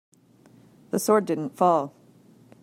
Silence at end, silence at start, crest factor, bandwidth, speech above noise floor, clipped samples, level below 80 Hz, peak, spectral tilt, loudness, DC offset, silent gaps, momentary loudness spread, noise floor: 0.75 s; 0.95 s; 20 dB; 16 kHz; 33 dB; under 0.1%; -76 dBFS; -8 dBFS; -5.5 dB/octave; -24 LUFS; under 0.1%; none; 9 LU; -56 dBFS